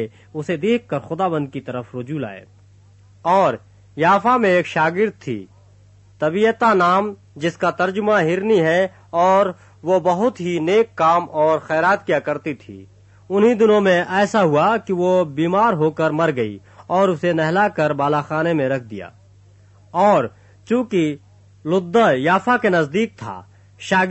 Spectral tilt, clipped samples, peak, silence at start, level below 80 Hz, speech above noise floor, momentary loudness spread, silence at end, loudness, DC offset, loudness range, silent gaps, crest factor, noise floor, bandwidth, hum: -6.5 dB/octave; under 0.1%; -4 dBFS; 0 s; -60 dBFS; 31 dB; 14 LU; 0 s; -18 LUFS; under 0.1%; 4 LU; none; 14 dB; -49 dBFS; 8.4 kHz; 50 Hz at -50 dBFS